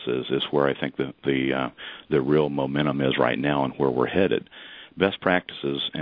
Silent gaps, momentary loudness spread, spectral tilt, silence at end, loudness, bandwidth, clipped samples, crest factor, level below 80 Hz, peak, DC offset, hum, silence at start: none; 7 LU; -9.5 dB/octave; 0 s; -24 LUFS; 5.2 kHz; under 0.1%; 20 dB; -56 dBFS; -4 dBFS; under 0.1%; none; 0 s